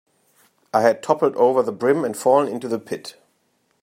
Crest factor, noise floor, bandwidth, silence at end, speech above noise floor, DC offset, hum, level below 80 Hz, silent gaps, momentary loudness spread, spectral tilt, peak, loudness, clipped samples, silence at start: 20 dB; -67 dBFS; 15.5 kHz; 0.75 s; 48 dB; under 0.1%; none; -74 dBFS; none; 12 LU; -5.5 dB/octave; -2 dBFS; -20 LUFS; under 0.1%; 0.75 s